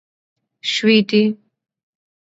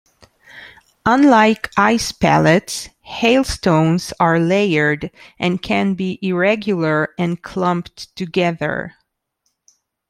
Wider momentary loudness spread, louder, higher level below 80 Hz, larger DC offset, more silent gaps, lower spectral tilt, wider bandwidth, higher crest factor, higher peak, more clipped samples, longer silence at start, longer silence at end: about the same, 13 LU vs 12 LU; about the same, -17 LUFS vs -17 LUFS; second, -70 dBFS vs -44 dBFS; neither; neither; about the same, -5 dB/octave vs -5.5 dB/octave; second, 8 kHz vs 15 kHz; about the same, 18 dB vs 16 dB; about the same, -2 dBFS vs 0 dBFS; neither; about the same, 0.65 s vs 0.55 s; second, 1 s vs 1.2 s